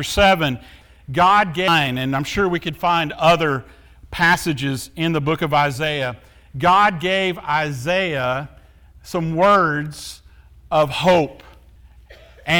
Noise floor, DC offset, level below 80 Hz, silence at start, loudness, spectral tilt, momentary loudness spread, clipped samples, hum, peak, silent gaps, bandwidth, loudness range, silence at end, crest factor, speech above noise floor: -46 dBFS; under 0.1%; -44 dBFS; 0 s; -18 LUFS; -5 dB/octave; 13 LU; under 0.1%; none; -4 dBFS; none; 20 kHz; 2 LU; 0 s; 16 dB; 28 dB